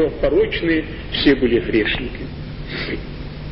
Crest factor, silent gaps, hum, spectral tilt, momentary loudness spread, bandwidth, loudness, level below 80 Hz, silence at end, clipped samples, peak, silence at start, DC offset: 18 dB; none; none; -10.5 dB/octave; 15 LU; 5.8 kHz; -19 LUFS; -32 dBFS; 0 s; under 0.1%; -2 dBFS; 0 s; under 0.1%